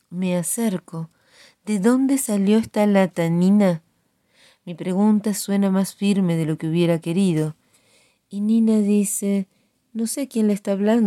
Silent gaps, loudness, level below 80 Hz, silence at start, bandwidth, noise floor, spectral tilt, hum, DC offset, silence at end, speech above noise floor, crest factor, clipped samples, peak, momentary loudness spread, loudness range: none; -20 LUFS; -66 dBFS; 0.1 s; 14.5 kHz; -66 dBFS; -6 dB/octave; none; under 0.1%; 0 s; 46 dB; 14 dB; under 0.1%; -6 dBFS; 12 LU; 2 LU